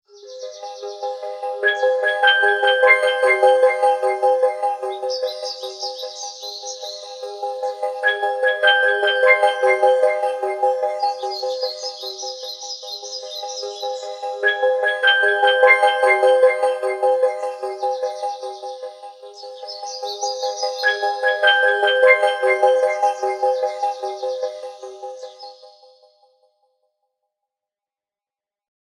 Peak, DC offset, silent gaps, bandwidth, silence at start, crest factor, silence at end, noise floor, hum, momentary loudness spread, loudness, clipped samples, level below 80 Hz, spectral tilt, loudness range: 0 dBFS; under 0.1%; none; 11.5 kHz; 0.15 s; 20 dB; 3.2 s; under -90 dBFS; none; 18 LU; -18 LUFS; under 0.1%; -88 dBFS; 2 dB/octave; 11 LU